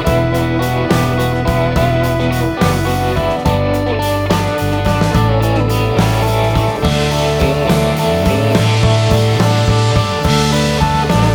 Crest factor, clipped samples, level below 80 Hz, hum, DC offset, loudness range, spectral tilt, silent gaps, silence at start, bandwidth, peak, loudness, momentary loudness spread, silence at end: 12 dB; under 0.1%; -24 dBFS; none; under 0.1%; 2 LU; -6 dB/octave; none; 0 s; over 20 kHz; 0 dBFS; -14 LUFS; 3 LU; 0 s